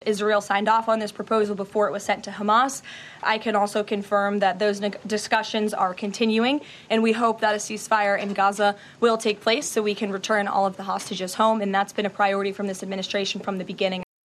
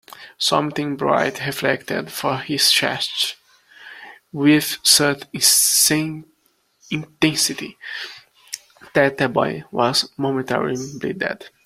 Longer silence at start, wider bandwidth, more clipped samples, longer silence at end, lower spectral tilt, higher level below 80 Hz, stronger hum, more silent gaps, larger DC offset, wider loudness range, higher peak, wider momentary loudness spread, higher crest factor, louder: second, 0.05 s vs 0.2 s; second, 13.5 kHz vs 16.5 kHz; neither; about the same, 0.25 s vs 0.15 s; first, -4 dB/octave vs -2.5 dB/octave; second, -70 dBFS vs -60 dBFS; neither; neither; neither; second, 2 LU vs 5 LU; second, -6 dBFS vs 0 dBFS; second, 7 LU vs 17 LU; second, 16 dB vs 22 dB; second, -23 LUFS vs -18 LUFS